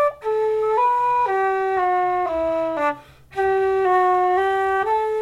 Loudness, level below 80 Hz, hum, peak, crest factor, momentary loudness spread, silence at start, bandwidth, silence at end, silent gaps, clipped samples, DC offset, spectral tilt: -20 LUFS; -52 dBFS; none; -10 dBFS; 10 dB; 5 LU; 0 s; 11.5 kHz; 0 s; none; under 0.1%; under 0.1%; -5.5 dB/octave